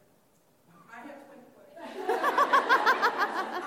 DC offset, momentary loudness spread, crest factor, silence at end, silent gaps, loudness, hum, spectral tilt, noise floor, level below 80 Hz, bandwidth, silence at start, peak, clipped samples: under 0.1%; 24 LU; 20 dB; 0 s; none; -26 LUFS; none; -2 dB/octave; -65 dBFS; -84 dBFS; 16.5 kHz; 0.9 s; -10 dBFS; under 0.1%